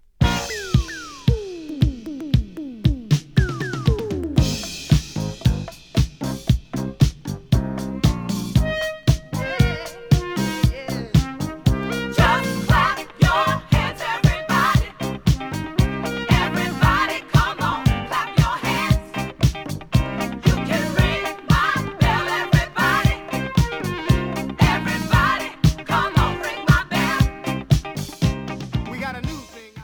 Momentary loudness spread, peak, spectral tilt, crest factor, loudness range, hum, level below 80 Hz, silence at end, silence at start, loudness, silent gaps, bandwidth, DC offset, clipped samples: 9 LU; -2 dBFS; -5.5 dB/octave; 18 dB; 3 LU; none; -28 dBFS; 0 s; 0.2 s; -21 LUFS; none; over 20 kHz; under 0.1%; under 0.1%